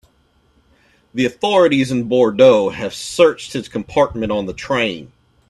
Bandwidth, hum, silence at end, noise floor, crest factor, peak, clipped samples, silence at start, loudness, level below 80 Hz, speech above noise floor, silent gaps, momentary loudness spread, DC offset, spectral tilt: 12 kHz; none; 0.45 s; -58 dBFS; 16 dB; 0 dBFS; under 0.1%; 1.15 s; -16 LUFS; -48 dBFS; 42 dB; none; 14 LU; under 0.1%; -5 dB/octave